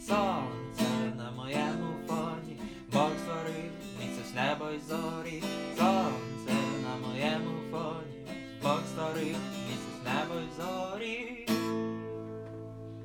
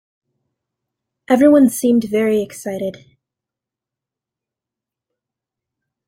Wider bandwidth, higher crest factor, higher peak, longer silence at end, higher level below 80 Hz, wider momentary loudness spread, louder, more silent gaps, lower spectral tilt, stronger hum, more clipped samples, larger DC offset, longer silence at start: first, 19.5 kHz vs 16 kHz; about the same, 20 dB vs 18 dB; second, -14 dBFS vs -2 dBFS; second, 0 s vs 3.15 s; about the same, -62 dBFS vs -64 dBFS; second, 11 LU vs 15 LU; second, -34 LUFS vs -15 LUFS; neither; about the same, -5.5 dB/octave vs -5.5 dB/octave; neither; neither; neither; second, 0 s vs 1.3 s